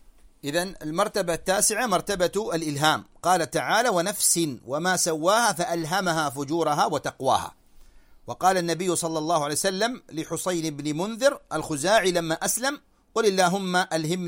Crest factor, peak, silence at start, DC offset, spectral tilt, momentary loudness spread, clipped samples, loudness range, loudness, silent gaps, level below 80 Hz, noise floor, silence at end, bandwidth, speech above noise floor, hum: 18 dB; -6 dBFS; 0.45 s; under 0.1%; -3 dB/octave; 8 LU; under 0.1%; 3 LU; -24 LUFS; none; -56 dBFS; -50 dBFS; 0 s; 16.5 kHz; 26 dB; none